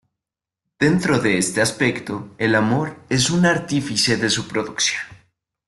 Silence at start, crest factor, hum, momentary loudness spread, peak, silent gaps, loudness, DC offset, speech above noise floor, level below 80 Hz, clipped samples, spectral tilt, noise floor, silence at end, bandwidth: 0.8 s; 16 dB; none; 7 LU; -4 dBFS; none; -19 LUFS; under 0.1%; 67 dB; -54 dBFS; under 0.1%; -4 dB/octave; -87 dBFS; 0.55 s; 12.5 kHz